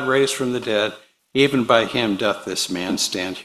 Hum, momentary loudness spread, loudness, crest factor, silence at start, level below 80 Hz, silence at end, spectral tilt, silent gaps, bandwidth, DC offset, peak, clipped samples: none; 6 LU; -20 LUFS; 20 dB; 0 s; -58 dBFS; 0 s; -3.5 dB/octave; none; 14.5 kHz; under 0.1%; 0 dBFS; under 0.1%